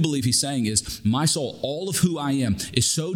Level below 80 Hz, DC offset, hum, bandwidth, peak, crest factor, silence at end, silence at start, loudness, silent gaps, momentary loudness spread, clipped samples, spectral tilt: -50 dBFS; under 0.1%; none; over 20 kHz; -4 dBFS; 20 dB; 0 s; 0 s; -23 LUFS; none; 4 LU; under 0.1%; -4 dB/octave